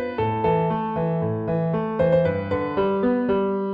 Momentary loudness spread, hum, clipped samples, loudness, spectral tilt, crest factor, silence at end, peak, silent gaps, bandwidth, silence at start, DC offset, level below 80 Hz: 5 LU; none; under 0.1%; -23 LUFS; -10.5 dB/octave; 12 dB; 0 s; -10 dBFS; none; 5 kHz; 0 s; under 0.1%; -48 dBFS